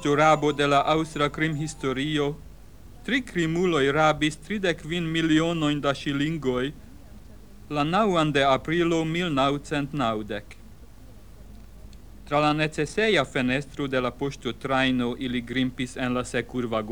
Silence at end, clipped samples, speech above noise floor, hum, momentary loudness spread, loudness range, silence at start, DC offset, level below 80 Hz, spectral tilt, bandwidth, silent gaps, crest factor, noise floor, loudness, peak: 0 s; under 0.1%; 23 dB; none; 8 LU; 4 LU; 0 s; 0.4%; -48 dBFS; -5.5 dB/octave; 19 kHz; none; 18 dB; -47 dBFS; -25 LUFS; -8 dBFS